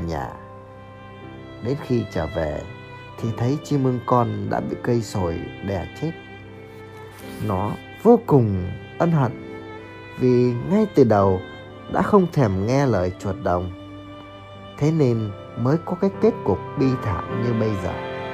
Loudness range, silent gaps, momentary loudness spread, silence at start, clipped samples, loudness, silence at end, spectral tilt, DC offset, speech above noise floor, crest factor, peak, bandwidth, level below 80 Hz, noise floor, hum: 7 LU; none; 21 LU; 0 s; under 0.1%; -22 LUFS; 0 s; -8 dB/octave; under 0.1%; 20 dB; 20 dB; -2 dBFS; 14.5 kHz; -46 dBFS; -41 dBFS; none